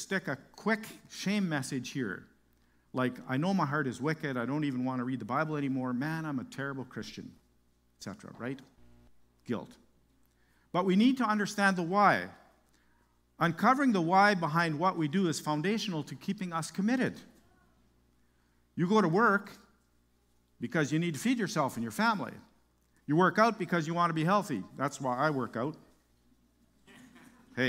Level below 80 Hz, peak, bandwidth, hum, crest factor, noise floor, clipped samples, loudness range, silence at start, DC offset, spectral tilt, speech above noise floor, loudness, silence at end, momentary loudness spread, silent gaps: -72 dBFS; -10 dBFS; 16 kHz; 60 Hz at -60 dBFS; 22 dB; -70 dBFS; under 0.1%; 9 LU; 0 s; under 0.1%; -5.5 dB/octave; 39 dB; -31 LUFS; 0 s; 16 LU; none